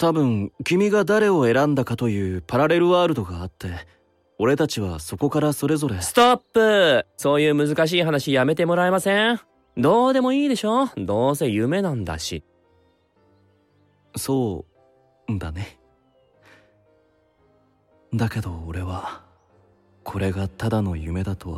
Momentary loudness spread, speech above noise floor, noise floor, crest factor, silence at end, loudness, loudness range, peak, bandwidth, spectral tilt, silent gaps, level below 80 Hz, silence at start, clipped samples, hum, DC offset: 15 LU; 40 dB; -61 dBFS; 18 dB; 0 s; -21 LUFS; 13 LU; -4 dBFS; 16 kHz; -5.5 dB/octave; none; -48 dBFS; 0 s; under 0.1%; none; under 0.1%